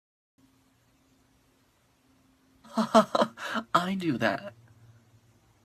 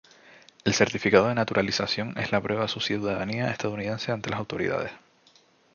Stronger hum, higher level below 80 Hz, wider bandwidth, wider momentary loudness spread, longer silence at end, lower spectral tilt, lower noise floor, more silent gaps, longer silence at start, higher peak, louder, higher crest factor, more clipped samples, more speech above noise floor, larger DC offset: neither; second, -70 dBFS vs -58 dBFS; first, 14 kHz vs 7.4 kHz; first, 13 LU vs 9 LU; first, 1.15 s vs 0.8 s; about the same, -5 dB/octave vs -4.5 dB/octave; first, -67 dBFS vs -60 dBFS; neither; first, 2.7 s vs 0.65 s; second, -6 dBFS vs -2 dBFS; about the same, -27 LUFS vs -26 LUFS; about the same, 26 dB vs 24 dB; neither; first, 41 dB vs 34 dB; neither